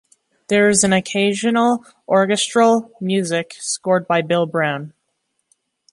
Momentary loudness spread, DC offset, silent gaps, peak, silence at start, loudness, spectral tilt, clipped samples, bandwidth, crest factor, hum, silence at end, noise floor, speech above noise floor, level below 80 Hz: 8 LU; under 0.1%; none; 0 dBFS; 0.5 s; -17 LUFS; -4 dB/octave; under 0.1%; 11.5 kHz; 18 dB; none; 1.05 s; -72 dBFS; 54 dB; -60 dBFS